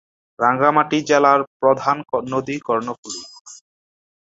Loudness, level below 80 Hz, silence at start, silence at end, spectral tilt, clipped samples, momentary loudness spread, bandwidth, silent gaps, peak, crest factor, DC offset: -18 LUFS; -64 dBFS; 0.4 s; 0.75 s; -4.5 dB/octave; under 0.1%; 15 LU; 8 kHz; 1.47-1.60 s, 2.98-3.03 s, 3.41-3.45 s; -2 dBFS; 18 dB; under 0.1%